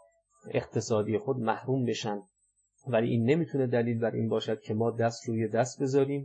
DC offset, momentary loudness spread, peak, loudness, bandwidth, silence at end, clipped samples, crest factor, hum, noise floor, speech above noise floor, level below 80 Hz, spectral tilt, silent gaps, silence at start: under 0.1%; 6 LU; -12 dBFS; -30 LUFS; 8.6 kHz; 0 s; under 0.1%; 16 dB; none; -73 dBFS; 44 dB; -72 dBFS; -6.5 dB/octave; none; 0.45 s